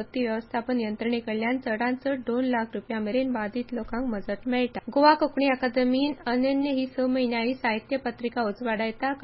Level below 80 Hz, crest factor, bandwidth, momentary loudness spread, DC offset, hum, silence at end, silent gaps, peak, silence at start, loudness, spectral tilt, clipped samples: -56 dBFS; 20 dB; 5.6 kHz; 7 LU; under 0.1%; none; 0 s; none; -6 dBFS; 0 s; -27 LUFS; -9.5 dB/octave; under 0.1%